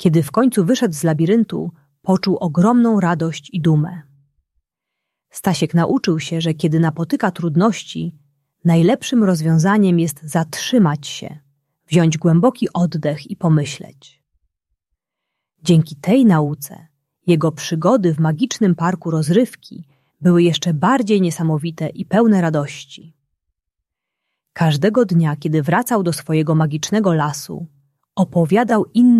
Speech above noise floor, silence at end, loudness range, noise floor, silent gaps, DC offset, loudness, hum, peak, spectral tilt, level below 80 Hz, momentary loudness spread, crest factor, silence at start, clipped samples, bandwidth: 64 dB; 0 s; 4 LU; -80 dBFS; none; under 0.1%; -17 LUFS; none; -2 dBFS; -6.5 dB/octave; -58 dBFS; 12 LU; 16 dB; 0 s; under 0.1%; 14 kHz